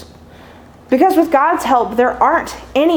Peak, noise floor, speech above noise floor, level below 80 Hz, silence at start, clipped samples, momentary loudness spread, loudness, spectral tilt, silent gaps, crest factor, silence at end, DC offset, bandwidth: 0 dBFS; -40 dBFS; 27 dB; -44 dBFS; 0 s; under 0.1%; 7 LU; -14 LUFS; -4.5 dB/octave; none; 14 dB; 0 s; under 0.1%; over 20 kHz